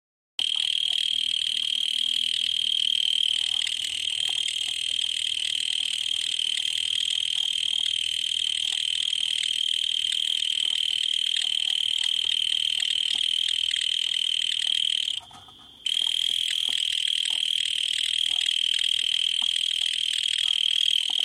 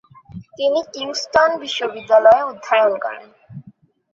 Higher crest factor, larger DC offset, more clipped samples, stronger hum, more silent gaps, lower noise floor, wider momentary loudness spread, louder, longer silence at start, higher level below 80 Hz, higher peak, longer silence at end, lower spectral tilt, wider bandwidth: about the same, 16 dB vs 16 dB; neither; neither; neither; neither; about the same, -48 dBFS vs -49 dBFS; second, 3 LU vs 13 LU; second, -23 LUFS vs -17 LUFS; about the same, 0.4 s vs 0.35 s; second, -68 dBFS vs -58 dBFS; second, -10 dBFS vs -2 dBFS; second, 0 s vs 0.45 s; second, 3.5 dB/octave vs -3 dB/octave; first, 16 kHz vs 7.6 kHz